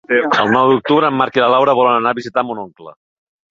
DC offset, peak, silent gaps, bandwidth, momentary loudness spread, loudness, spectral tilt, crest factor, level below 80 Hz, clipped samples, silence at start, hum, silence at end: under 0.1%; 0 dBFS; none; 7.4 kHz; 9 LU; -14 LUFS; -6 dB/octave; 14 dB; -60 dBFS; under 0.1%; 0.1 s; none; 0.6 s